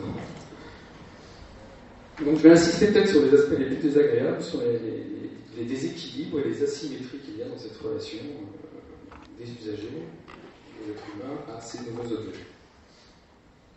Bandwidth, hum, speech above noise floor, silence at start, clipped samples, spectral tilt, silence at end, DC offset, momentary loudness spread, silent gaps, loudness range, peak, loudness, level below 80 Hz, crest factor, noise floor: 8.4 kHz; none; 32 dB; 0 s; under 0.1%; -6 dB/octave; 1.25 s; under 0.1%; 27 LU; none; 18 LU; -2 dBFS; -24 LUFS; -56 dBFS; 24 dB; -56 dBFS